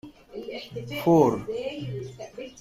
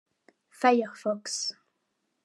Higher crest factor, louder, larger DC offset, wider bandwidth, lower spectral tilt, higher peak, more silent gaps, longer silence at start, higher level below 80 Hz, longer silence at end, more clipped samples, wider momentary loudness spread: about the same, 20 dB vs 22 dB; about the same, -26 LUFS vs -28 LUFS; neither; first, 15.5 kHz vs 12.5 kHz; first, -7 dB/octave vs -2.5 dB/octave; about the same, -6 dBFS vs -8 dBFS; neither; second, 0.05 s vs 0.6 s; first, -58 dBFS vs under -90 dBFS; second, 0 s vs 0.75 s; neither; first, 20 LU vs 8 LU